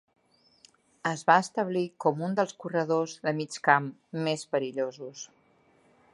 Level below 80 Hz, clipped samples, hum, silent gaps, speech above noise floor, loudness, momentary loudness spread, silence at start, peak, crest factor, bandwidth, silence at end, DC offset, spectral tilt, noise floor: -80 dBFS; under 0.1%; none; none; 36 dB; -28 LUFS; 13 LU; 1.05 s; -6 dBFS; 24 dB; 11.5 kHz; 0.9 s; under 0.1%; -5 dB/octave; -64 dBFS